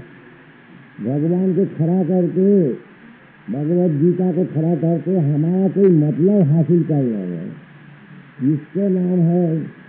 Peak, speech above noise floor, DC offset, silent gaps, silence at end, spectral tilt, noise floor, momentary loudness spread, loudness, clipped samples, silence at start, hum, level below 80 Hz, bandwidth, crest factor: -4 dBFS; 28 dB; under 0.1%; none; 0.15 s; -11.5 dB/octave; -44 dBFS; 9 LU; -17 LUFS; under 0.1%; 0 s; none; -70 dBFS; 3.4 kHz; 14 dB